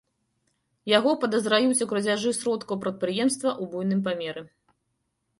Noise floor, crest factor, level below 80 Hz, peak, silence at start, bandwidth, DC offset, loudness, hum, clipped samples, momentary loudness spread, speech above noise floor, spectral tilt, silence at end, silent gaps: -77 dBFS; 20 dB; -70 dBFS; -6 dBFS; 0.85 s; 11.5 kHz; under 0.1%; -25 LUFS; none; under 0.1%; 9 LU; 52 dB; -4 dB/octave; 0.95 s; none